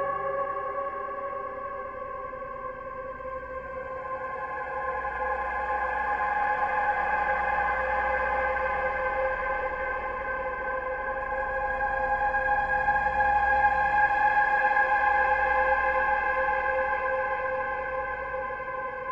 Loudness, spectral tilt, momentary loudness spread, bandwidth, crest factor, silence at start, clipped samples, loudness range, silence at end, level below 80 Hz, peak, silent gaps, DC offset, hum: -27 LUFS; -6 dB/octave; 13 LU; 7.8 kHz; 16 dB; 0 s; under 0.1%; 11 LU; 0 s; -48 dBFS; -12 dBFS; none; under 0.1%; none